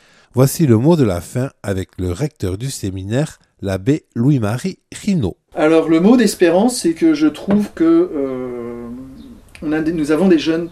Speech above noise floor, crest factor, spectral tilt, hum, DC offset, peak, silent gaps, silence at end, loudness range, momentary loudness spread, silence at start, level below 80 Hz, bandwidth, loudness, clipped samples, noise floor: 23 dB; 16 dB; -6.5 dB/octave; none; under 0.1%; 0 dBFS; none; 0 s; 6 LU; 13 LU; 0.35 s; -46 dBFS; 15.5 kHz; -16 LUFS; under 0.1%; -38 dBFS